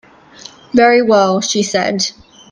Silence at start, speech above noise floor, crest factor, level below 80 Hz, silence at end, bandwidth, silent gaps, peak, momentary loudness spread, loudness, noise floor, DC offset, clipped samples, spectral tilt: 0.75 s; 26 dB; 14 dB; -54 dBFS; 0.4 s; 10.5 kHz; none; 0 dBFS; 8 LU; -13 LUFS; -39 dBFS; under 0.1%; under 0.1%; -3.5 dB/octave